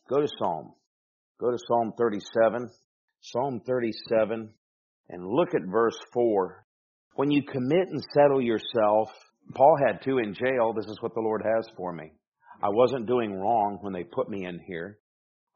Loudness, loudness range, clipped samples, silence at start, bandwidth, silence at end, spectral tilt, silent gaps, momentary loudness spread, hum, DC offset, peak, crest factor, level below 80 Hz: -27 LUFS; 5 LU; under 0.1%; 0.1 s; 7 kHz; 0.6 s; -5 dB/octave; 0.87-1.35 s, 2.84-3.08 s, 4.58-5.04 s, 6.64-7.11 s, 12.27-12.32 s; 14 LU; none; under 0.1%; -6 dBFS; 20 dB; -70 dBFS